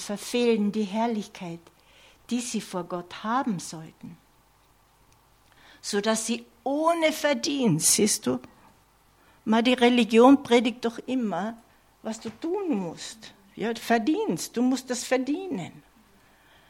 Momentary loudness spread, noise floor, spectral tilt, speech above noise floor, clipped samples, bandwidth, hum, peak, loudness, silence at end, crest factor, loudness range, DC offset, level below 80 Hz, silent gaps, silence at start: 18 LU; -61 dBFS; -3.5 dB/octave; 36 dB; under 0.1%; 16.5 kHz; none; -6 dBFS; -25 LUFS; 0.9 s; 22 dB; 10 LU; under 0.1%; -66 dBFS; none; 0 s